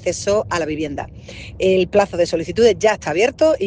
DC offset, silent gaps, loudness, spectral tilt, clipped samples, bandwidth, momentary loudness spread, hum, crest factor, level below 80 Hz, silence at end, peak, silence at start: under 0.1%; none; -18 LUFS; -4.5 dB/octave; under 0.1%; 10 kHz; 14 LU; none; 16 dB; -44 dBFS; 0 s; -2 dBFS; 0 s